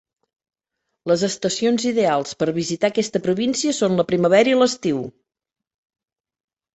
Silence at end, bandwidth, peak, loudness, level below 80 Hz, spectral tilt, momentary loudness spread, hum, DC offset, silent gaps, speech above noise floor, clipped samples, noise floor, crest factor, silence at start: 1.65 s; 8.4 kHz; -4 dBFS; -20 LUFS; -62 dBFS; -4.5 dB/octave; 8 LU; none; under 0.1%; none; 60 dB; under 0.1%; -79 dBFS; 18 dB; 1.05 s